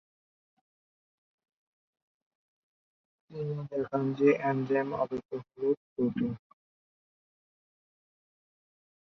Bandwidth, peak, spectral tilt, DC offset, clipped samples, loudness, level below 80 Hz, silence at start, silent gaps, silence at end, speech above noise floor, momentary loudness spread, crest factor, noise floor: 6.2 kHz; -12 dBFS; -9 dB/octave; under 0.1%; under 0.1%; -31 LUFS; -72 dBFS; 3.3 s; 5.25-5.29 s, 5.77-5.96 s; 2.85 s; over 60 dB; 13 LU; 22 dB; under -90 dBFS